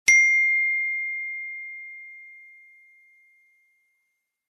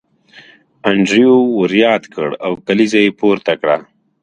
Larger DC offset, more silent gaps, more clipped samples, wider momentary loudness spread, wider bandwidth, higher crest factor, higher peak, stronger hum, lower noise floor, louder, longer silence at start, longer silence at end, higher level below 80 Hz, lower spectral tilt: neither; neither; neither; first, 25 LU vs 10 LU; first, 13.5 kHz vs 10 kHz; first, 24 dB vs 14 dB; about the same, -2 dBFS vs 0 dBFS; neither; first, -77 dBFS vs -44 dBFS; second, -20 LUFS vs -14 LUFS; second, 0.05 s vs 0.85 s; first, 2.15 s vs 0.4 s; second, -74 dBFS vs -58 dBFS; second, 3.5 dB/octave vs -5.5 dB/octave